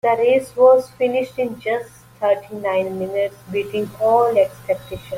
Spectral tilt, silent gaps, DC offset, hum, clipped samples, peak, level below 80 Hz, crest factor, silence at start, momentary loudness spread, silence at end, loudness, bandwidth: -5.5 dB/octave; none; under 0.1%; none; under 0.1%; -2 dBFS; -54 dBFS; 16 dB; 0.05 s; 11 LU; 0 s; -19 LUFS; 16 kHz